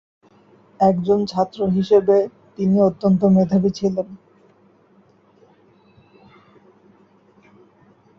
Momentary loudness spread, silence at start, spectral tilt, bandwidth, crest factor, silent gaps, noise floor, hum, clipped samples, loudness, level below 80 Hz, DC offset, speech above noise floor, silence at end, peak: 9 LU; 0.8 s; -9 dB/octave; 7 kHz; 18 dB; none; -55 dBFS; none; under 0.1%; -18 LUFS; -58 dBFS; under 0.1%; 38 dB; 4 s; -4 dBFS